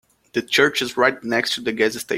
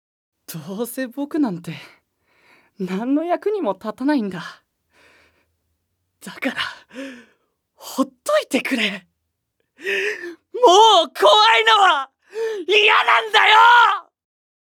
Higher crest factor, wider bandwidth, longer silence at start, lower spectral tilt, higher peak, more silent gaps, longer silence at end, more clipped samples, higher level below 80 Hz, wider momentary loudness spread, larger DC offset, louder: about the same, 20 dB vs 20 dB; second, 16.5 kHz vs 19 kHz; second, 0.35 s vs 0.5 s; about the same, -3 dB/octave vs -3 dB/octave; about the same, -2 dBFS vs 0 dBFS; neither; second, 0 s vs 0.75 s; neither; first, -62 dBFS vs -74 dBFS; second, 7 LU vs 23 LU; neither; second, -20 LUFS vs -16 LUFS